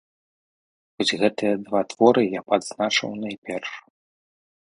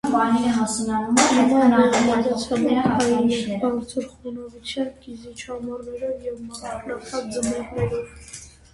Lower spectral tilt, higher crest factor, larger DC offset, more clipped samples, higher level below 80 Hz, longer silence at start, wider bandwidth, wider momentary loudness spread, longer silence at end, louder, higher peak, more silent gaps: about the same, -4 dB/octave vs -4.5 dB/octave; about the same, 22 dB vs 20 dB; neither; neither; second, -66 dBFS vs -50 dBFS; first, 1 s vs 0.05 s; about the same, 11.5 kHz vs 11.5 kHz; second, 13 LU vs 18 LU; first, 0.95 s vs 0.25 s; about the same, -23 LUFS vs -22 LUFS; about the same, -2 dBFS vs -2 dBFS; first, 3.38-3.42 s vs none